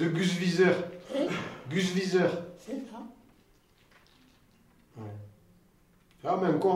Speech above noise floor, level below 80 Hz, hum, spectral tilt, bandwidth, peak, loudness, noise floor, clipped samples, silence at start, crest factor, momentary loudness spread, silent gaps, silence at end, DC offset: 35 dB; -68 dBFS; none; -6 dB/octave; 14 kHz; -12 dBFS; -29 LUFS; -63 dBFS; under 0.1%; 0 s; 20 dB; 20 LU; none; 0 s; under 0.1%